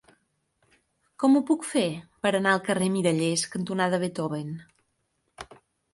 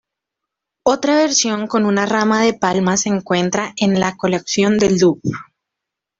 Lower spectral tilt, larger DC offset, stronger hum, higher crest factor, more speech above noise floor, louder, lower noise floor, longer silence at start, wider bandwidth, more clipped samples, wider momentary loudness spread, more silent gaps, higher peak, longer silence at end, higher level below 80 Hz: about the same, -5 dB/octave vs -4 dB/octave; neither; neither; about the same, 18 dB vs 16 dB; second, 50 dB vs 66 dB; second, -26 LUFS vs -16 LUFS; second, -75 dBFS vs -82 dBFS; first, 1.2 s vs 0.85 s; first, 11.5 kHz vs 7.8 kHz; neither; first, 19 LU vs 6 LU; neither; second, -10 dBFS vs -2 dBFS; second, 0.4 s vs 0.8 s; second, -68 dBFS vs -54 dBFS